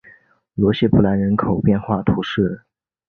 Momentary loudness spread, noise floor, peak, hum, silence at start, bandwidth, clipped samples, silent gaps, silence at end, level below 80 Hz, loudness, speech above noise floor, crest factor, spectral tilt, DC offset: 7 LU; -51 dBFS; -2 dBFS; none; 0.55 s; 6.2 kHz; under 0.1%; none; 0.5 s; -40 dBFS; -18 LUFS; 34 dB; 16 dB; -9.5 dB/octave; under 0.1%